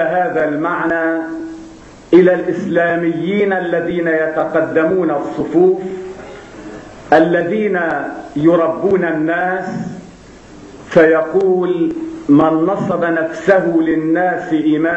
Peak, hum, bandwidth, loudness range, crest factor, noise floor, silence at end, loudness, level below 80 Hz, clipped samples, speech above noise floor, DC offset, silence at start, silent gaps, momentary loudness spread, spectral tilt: 0 dBFS; none; 8 kHz; 2 LU; 14 dB; -38 dBFS; 0 s; -15 LUFS; -50 dBFS; under 0.1%; 24 dB; under 0.1%; 0 s; none; 15 LU; -7.5 dB/octave